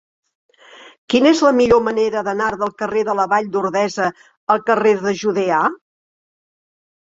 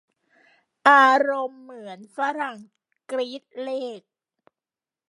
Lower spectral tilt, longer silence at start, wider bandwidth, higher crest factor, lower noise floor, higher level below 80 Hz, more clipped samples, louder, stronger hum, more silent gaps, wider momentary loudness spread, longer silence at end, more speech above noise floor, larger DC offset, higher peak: first, -5 dB/octave vs -3 dB/octave; about the same, 0.8 s vs 0.85 s; second, 7.8 kHz vs 11.5 kHz; second, 16 dB vs 24 dB; second, -44 dBFS vs under -90 dBFS; first, -52 dBFS vs -84 dBFS; neither; first, -17 LUFS vs -21 LUFS; neither; first, 0.98-1.08 s, 4.37-4.47 s vs none; second, 8 LU vs 25 LU; first, 1.3 s vs 1.15 s; second, 28 dB vs over 68 dB; neither; about the same, -2 dBFS vs -2 dBFS